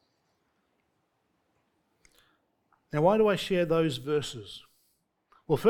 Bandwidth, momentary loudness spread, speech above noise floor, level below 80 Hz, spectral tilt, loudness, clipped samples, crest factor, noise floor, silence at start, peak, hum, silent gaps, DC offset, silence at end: 18.5 kHz; 19 LU; 49 dB; -60 dBFS; -6 dB/octave; -27 LUFS; under 0.1%; 20 dB; -75 dBFS; 2.95 s; -10 dBFS; none; none; under 0.1%; 0 s